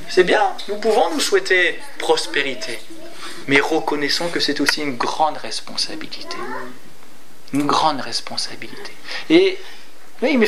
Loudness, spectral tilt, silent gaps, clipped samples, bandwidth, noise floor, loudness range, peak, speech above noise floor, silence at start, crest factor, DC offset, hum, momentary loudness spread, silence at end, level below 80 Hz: -19 LUFS; -3 dB/octave; none; under 0.1%; 15.5 kHz; -47 dBFS; 5 LU; 0 dBFS; 27 dB; 0 s; 20 dB; 5%; none; 17 LU; 0 s; -70 dBFS